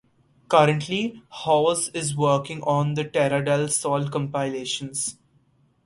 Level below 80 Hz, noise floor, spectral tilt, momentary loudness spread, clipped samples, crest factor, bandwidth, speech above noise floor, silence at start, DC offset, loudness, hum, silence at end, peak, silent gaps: -62 dBFS; -62 dBFS; -4.5 dB/octave; 9 LU; under 0.1%; 22 dB; 11.5 kHz; 39 dB; 0.5 s; under 0.1%; -23 LUFS; none; 0.75 s; -2 dBFS; none